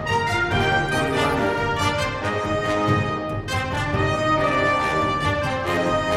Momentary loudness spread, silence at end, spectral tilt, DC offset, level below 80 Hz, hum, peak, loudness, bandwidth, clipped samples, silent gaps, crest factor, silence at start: 4 LU; 0 s; -5 dB/octave; under 0.1%; -40 dBFS; none; -8 dBFS; -21 LUFS; 15.5 kHz; under 0.1%; none; 14 dB; 0 s